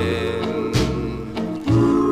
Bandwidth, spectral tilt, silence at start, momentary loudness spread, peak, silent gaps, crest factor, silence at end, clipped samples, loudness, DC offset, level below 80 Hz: 15.5 kHz; -7 dB/octave; 0 s; 10 LU; -6 dBFS; none; 14 dB; 0 s; under 0.1%; -21 LUFS; 0.2%; -36 dBFS